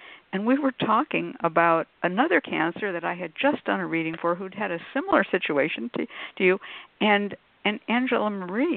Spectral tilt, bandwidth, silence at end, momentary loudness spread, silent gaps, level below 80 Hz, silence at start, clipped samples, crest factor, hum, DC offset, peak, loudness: -10 dB/octave; 4.5 kHz; 0 s; 8 LU; none; -70 dBFS; 0 s; under 0.1%; 22 dB; none; under 0.1%; -4 dBFS; -25 LUFS